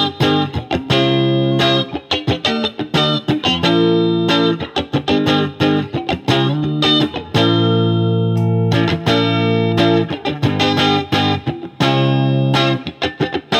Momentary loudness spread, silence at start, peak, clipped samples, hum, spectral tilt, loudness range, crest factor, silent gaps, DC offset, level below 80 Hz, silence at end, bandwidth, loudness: 6 LU; 0 s; -2 dBFS; under 0.1%; none; -6.5 dB/octave; 1 LU; 14 dB; none; under 0.1%; -48 dBFS; 0 s; 13.5 kHz; -16 LUFS